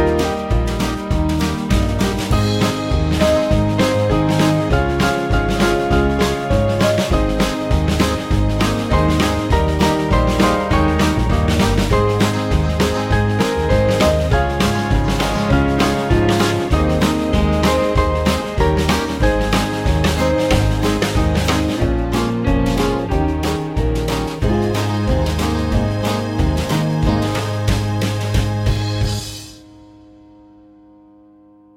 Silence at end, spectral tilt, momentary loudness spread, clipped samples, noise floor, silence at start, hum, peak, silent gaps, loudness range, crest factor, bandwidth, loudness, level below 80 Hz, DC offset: 2.15 s; -6 dB/octave; 4 LU; under 0.1%; -47 dBFS; 0 s; none; -2 dBFS; none; 3 LU; 16 dB; 16.5 kHz; -17 LUFS; -24 dBFS; under 0.1%